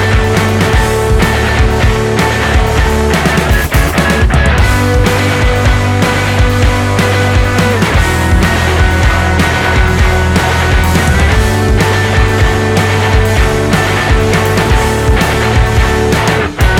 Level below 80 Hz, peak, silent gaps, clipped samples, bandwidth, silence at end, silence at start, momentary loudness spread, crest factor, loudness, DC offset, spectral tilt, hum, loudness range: -14 dBFS; 0 dBFS; none; under 0.1%; 17.5 kHz; 0 s; 0 s; 1 LU; 8 dB; -10 LUFS; under 0.1%; -5 dB/octave; none; 0 LU